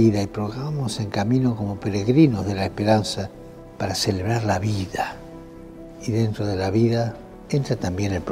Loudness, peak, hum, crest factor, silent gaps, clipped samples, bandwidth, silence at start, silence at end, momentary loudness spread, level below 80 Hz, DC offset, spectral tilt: -23 LUFS; -4 dBFS; none; 18 dB; none; under 0.1%; 15 kHz; 0 s; 0 s; 19 LU; -48 dBFS; under 0.1%; -6.5 dB/octave